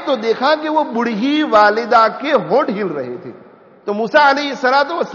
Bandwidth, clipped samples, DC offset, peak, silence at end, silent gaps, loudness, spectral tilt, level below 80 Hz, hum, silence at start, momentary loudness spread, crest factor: 7.2 kHz; under 0.1%; under 0.1%; 0 dBFS; 0 s; none; -15 LUFS; -2 dB/octave; -60 dBFS; none; 0 s; 12 LU; 14 dB